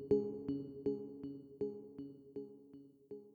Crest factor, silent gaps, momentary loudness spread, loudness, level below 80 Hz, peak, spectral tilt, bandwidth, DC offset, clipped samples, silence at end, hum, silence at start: 22 dB; none; 17 LU; -43 LUFS; -72 dBFS; -22 dBFS; -10.5 dB/octave; 4.7 kHz; under 0.1%; under 0.1%; 0 s; none; 0 s